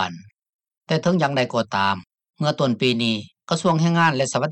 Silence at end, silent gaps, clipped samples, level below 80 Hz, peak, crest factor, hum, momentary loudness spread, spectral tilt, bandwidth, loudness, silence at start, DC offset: 0 s; 0.55-0.59 s; under 0.1%; -66 dBFS; -6 dBFS; 16 dB; none; 8 LU; -5 dB/octave; 9.2 kHz; -21 LUFS; 0 s; under 0.1%